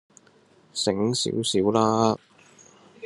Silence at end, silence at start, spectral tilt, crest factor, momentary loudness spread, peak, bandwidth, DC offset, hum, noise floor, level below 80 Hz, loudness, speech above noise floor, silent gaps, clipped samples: 0 s; 0.75 s; -4.5 dB/octave; 20 dB; 8 LU; -6 dBFS; 12 kHz; under 0.1%; none; -58 dBFS; -66 dBFS; -24 LUFS; 35 dB; none; under 0.1%